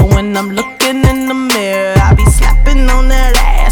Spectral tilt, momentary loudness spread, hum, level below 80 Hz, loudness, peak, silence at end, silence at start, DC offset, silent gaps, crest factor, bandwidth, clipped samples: -5 dB/octave; 6 LU; none; -10 dBFS; -11 LUFS; 0 dBFS; 0 s; 0 s; under 0.1%; none; 8 dB; 19 kHz; under 0.1%